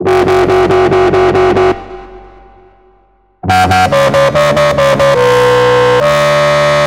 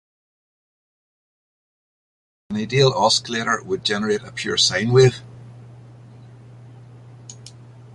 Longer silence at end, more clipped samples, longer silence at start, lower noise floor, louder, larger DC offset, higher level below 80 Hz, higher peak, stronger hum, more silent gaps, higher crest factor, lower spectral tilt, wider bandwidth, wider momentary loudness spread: about the same, 0 s vs 0 s; neither; second, 0 s vs 2.5 s; first, -50 dBFS vs -43 dBFS; first, -9 LUFS vs -19 LUFS; neither; first, -34 dBFS vs -56 dBFS; first, 0 dBFS vs -4 dBFS; neither; neither; second, 10 dB vs 20 dB; first, -5.5 dB/octave vs -4 dB/octave; first, 16.5 kHz vs 11.5 kHz; second, 3 LU vs 23 LU